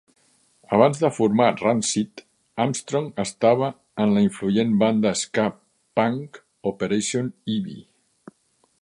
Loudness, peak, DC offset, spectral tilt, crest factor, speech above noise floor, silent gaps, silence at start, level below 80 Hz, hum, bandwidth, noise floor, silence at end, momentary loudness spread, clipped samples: -22 LUFS; -2 dBFS; under 0.1%; -5 dB/octave; 22 dB; 44 dB; none; 0.7 s; -62 dBFS; none; 11 kHz; -66 dBFS; 1 s; 11 LU; under 0.1%